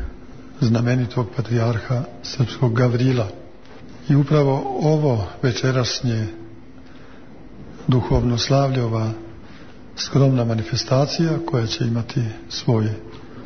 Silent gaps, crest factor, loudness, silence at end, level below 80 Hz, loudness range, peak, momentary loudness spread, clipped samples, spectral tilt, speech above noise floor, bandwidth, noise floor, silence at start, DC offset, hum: none; 16 dB; -20 LUFS; 0 s; -42 dBFS; 3 LU; -4 dBFS; 17 LU; under 0.1%; -6.5 dB/octave; 24 dB; 6.6 kHz; -43 dBFS; 0 s; 0.9%; none